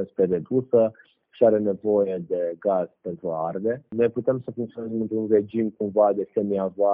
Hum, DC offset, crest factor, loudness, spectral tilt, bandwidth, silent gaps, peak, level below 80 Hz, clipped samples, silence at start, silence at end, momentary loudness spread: none; under 0.1%; 18 dB; -24 LUFS; -8.5 dB/octave; 3.7 kHz; none; -6 dBFS; -66 dBFS; under 0.1%; 0 s; 0 s; 9 LU